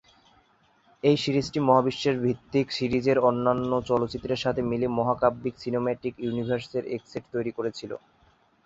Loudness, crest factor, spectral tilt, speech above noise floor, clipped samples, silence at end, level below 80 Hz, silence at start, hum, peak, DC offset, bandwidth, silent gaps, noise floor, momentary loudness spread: -26 LUFS; 20 dB; -6.5 dB/octave; 37 dB; under 0.1%; 0.7 s; -56 dBFS; 1.05 s; none; -6 dBFS; under 0.1%; 8 kHz; none; -63 dBFS; 11 LU